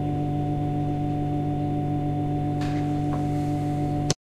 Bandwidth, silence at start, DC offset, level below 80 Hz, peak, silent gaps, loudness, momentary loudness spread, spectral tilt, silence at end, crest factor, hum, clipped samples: 11 kHz; 0 s; under 0.1%; -40 dBFS; -4 dBFS; none; -26 LUFS; 1 LU; -7 dB/octave; 0.2 s; 20 dB; none; under 0.1%